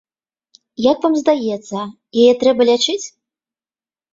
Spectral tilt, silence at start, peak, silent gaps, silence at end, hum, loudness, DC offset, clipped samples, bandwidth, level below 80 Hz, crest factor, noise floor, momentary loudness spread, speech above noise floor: -4 dB/octave; 0.8 s; -2 dBFS; none; 1.05 s; none; -16 LUFS; under 0.1%; under 0.1%; 7.8 kHz; -60 dBFS; 16 dB; under -90 dBFS; 14 LU; over 75 dB